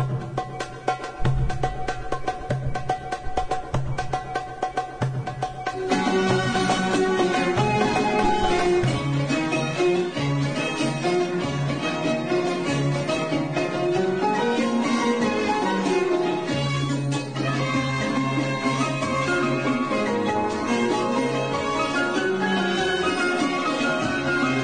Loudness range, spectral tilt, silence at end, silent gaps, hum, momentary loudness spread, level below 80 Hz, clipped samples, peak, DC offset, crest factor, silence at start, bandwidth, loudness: 6 LU; -5.5 dB/octave; 0 s; none; none; 7 LU; -42 dBFS; under 0.1%; -8 dBFS; 0.3%; 16 dB; 0 s; 10 kHz; -24 LUFS